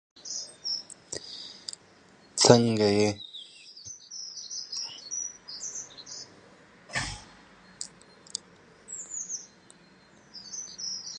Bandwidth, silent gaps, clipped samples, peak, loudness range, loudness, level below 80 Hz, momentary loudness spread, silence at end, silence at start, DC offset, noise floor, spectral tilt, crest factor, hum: 11.5 kHz; none; under 0.1%; -2 dBFS; 13 LU; -30 LUFS; -60 dBFS; 20 LU; 0 s; 0.15 s; under 0.1%; -57 dBFS; -3.5 dB/octave; 30 dB; none